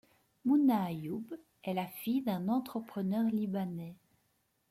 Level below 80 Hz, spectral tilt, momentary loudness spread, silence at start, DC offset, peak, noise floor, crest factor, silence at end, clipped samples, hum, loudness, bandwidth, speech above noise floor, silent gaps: -76 dBFS; -7.5 dB/octave; 14 LU; 0.45 s; under 0.1%; -18 dBFS; -76 dBFS; 16 dB; 0.75 s; under 0.1%; none; -34 LUFS; 16 kHz; 43 dB; none